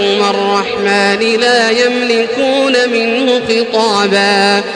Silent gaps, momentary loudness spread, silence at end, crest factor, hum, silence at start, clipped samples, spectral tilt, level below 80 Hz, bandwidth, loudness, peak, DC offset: none; 3 LU; 0 s; 12 dB; none; 0 s; under 0.1%; -3.5 dB/octave; -54 dBFS; 10.5 kHz; -11 LUFS; 0 dBFS; under 0.1%